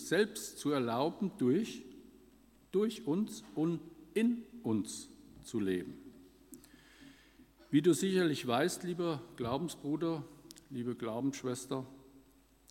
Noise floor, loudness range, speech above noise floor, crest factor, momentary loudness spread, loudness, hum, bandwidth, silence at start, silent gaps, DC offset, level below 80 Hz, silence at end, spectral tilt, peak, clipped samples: -65 dBFS; 5 LU; 30 dB; 20 dB; 19 LU; -35 LUFS; none; 16.5 kHz; 0 s; none; under 0.1%; -70 dBFS; 0.5 s; -5.5 dB/octave; -16 dBFS; under 0.1%